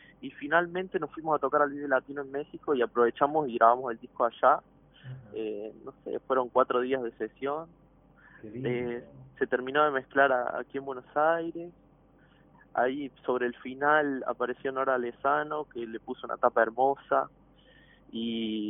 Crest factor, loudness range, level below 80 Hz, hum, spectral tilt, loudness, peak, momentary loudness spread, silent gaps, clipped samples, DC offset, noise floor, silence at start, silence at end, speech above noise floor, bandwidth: 22 dB; 4 LU; -68 dBFS; none; -9 dB/octave; -29 LUFS; -6 dBFS; 14 LU; none; under 0.1%; under 0.1%; -60 dBFS; 0.2 s; 0 s; 31 dB; 3.8 kHz